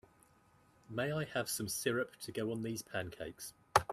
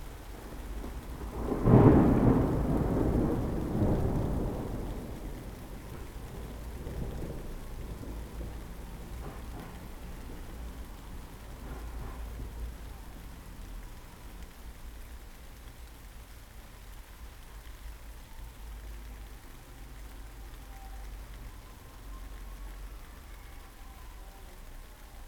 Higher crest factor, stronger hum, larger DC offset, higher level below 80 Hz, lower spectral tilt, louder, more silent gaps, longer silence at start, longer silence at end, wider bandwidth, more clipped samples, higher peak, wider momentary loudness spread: about the same, 28 dB vs 28 dB; neither; neither; second, -66 dBFS vs -40 dBFS; second, -4 dB/octave vs -8 dB/octave; second, -38 LUFS vs -32 LUFS; neither; first, 0.9 s vs 0 s; about the same, 0 s vs 0 s; second, 15.5 kHz vs 19.5 kHz; neither; second, -10 dBFS vs -6 dBFS; second, 11 LU vs 21 LU